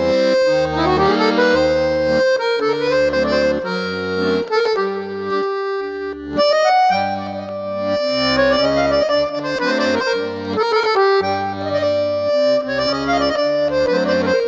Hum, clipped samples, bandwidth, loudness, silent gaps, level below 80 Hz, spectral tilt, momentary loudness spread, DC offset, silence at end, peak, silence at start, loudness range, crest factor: none; under 0.1%; 8 kHz; -17 LUFS; none; -42 dBFS; -5 dB/octave; 8 LU; under 0.1%; 0 s; -4 dBFS; 0 s; 3 LU; 14 dB